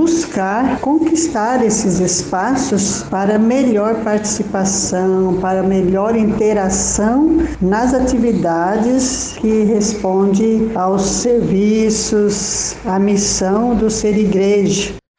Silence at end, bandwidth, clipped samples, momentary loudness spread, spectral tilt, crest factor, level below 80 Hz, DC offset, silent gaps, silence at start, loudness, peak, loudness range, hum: 0.2 s; 10 kHz; under 0.1%; 3 LU; -4.5 dB/octave; 12 dB; -36 dBFS; under 0.1%; none; 0 s; -15 LUFS; -4 dBFS; 1 LU; none